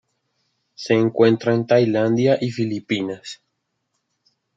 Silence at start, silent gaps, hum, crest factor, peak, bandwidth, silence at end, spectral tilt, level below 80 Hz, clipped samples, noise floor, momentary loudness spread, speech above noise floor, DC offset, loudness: 0.8 s; none; none; 18 dB; -2 dBFS; 7.8 kHz; 1.2 s; -7 dB/octave; -66 dBFS; under 0.1%; -75 dBFS; 17 LU; 56 dB; under 0.1%; -19 LUFS